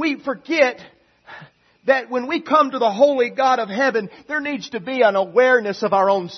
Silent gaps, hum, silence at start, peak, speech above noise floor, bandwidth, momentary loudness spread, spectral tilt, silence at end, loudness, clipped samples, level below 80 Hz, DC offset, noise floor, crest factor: none; none; 0 s; -2 dBFS; 27 dB; 6.4 kHz; 10 LU; -4.5 dB/octave; 0 s; -19 LUFS; under 0.1%; -70 dBFS; under 0.1%; -45 dBFS; 16 dB